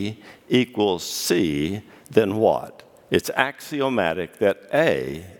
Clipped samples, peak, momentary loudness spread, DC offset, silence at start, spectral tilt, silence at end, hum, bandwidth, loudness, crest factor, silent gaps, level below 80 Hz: under 0.1%; 0 dBFS; 8 LU; under 0.1%; 0 s; -4.5 dB/octave; 0.05 s; none; 18.5 kHz; -22 LUFS; 22 dB; none; -56 dBFS